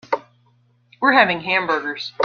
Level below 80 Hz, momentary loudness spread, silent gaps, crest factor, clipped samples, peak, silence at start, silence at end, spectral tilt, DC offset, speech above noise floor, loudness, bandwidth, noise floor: -64 dBFS; 12 LU; none; 20 dB; under 0.1%; -2 dBFS; 0.1 s; 0 s; -5 dB/octave; under 0.1%; 41 dB; -18 LUFS; 7 kHz; -59 dBFS